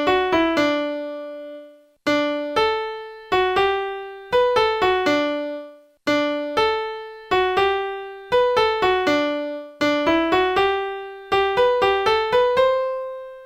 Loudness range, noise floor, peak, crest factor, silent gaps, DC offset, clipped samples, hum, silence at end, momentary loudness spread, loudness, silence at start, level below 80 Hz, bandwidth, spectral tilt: 4 LU; -44 dBFS; -6 dBFS; 14 dB; none; under 0.1%; under 0.1%; none; 0 s; 13 LU; -20 LUFS; 0 s; -50 dBFS; 16 kHz; -4.5 dB/octave